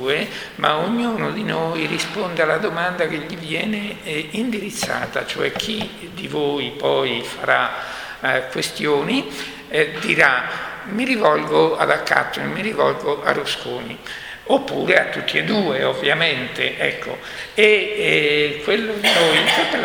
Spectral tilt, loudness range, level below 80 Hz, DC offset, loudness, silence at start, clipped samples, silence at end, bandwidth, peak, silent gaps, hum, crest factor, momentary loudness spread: -4 dB/octave; 5 LU; -54 dBFS; under 0.1%; -19 LUFS; 0 s; under 0.1%; 0 s; over 20 kHz; 0 dBFS; none; none; 20 dB; 12 LU